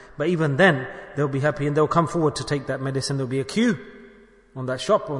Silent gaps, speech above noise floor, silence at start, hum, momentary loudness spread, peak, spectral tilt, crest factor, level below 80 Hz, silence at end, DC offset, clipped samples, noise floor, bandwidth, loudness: none; 28 dB; 0 s; none; 11 LU; -4 dBFS; -6 dB/octave; 18 dB; -54 dBFS; 0 s; under 0.1%; under 0.1%; -50 dBFS; 11 kHz; -23 LUFS